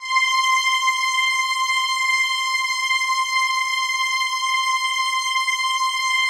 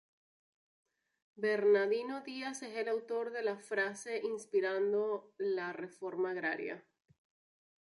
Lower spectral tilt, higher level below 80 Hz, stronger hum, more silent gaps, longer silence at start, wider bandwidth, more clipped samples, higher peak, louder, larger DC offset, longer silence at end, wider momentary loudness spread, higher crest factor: second, 8 dB/octave vs -4 dB/octave; first, -70 dBFS vs -90 dBFS; neither; neither; second, 0 s vs 1.35 s; first, 16 kHz vs 11.5 kHz; neither; first, -8 dBFS vs -20 dBFS; first, -19 LUFS vs -36 LUFS; neither; second, 0 s vs 1.05 s; second, 3 LU vs 11 LU; about the same, 12 dB vs 16 dB